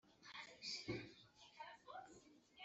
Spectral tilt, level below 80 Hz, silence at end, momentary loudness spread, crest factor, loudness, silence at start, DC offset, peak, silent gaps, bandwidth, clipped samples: -2.5 dB/octave; -78 dBFS; 0 s; 16 LU; 22 dB; -53 LUFS; 0.05 s; under 0.1%; -34 dBFS; none; 8 kHz; under 0.1%